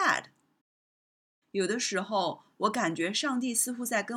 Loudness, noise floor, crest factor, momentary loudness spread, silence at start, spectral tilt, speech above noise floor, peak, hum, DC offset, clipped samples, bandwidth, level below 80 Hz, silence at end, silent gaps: -30 LUFS; under -90 dBFS; 20 dB; 4 LU; 0 s; -2.5 dB/octave; over 60 dB; -12 dBFS; none; under 0.1%; under 0.1%; 17.5 kHz; -82 dBFS; 0 s; 0.61-1.42 s